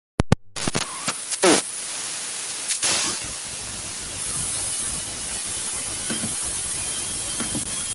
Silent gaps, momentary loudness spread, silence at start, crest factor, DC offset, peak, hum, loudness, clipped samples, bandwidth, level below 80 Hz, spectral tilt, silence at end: none; 8 LU; 0.2 s; 26 dB; under 0.1%; 0 dBFS; none; -24 LUFS; under 0.1%; 12 kHz; -44 dBFS; -2.5 dB/octave; 0 s